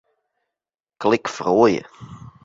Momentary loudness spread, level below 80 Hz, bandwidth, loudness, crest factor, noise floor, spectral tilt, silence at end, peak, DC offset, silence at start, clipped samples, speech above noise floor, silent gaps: 21 LU; -58 dBFS; 7.8 kHz; -19 LUFS; 20 dB; -89 dBFS; -5.5 dB/octave; 0.15 s; -4 dBFS; under 0.1%; 1 s; under 0.1%; 70 dB; none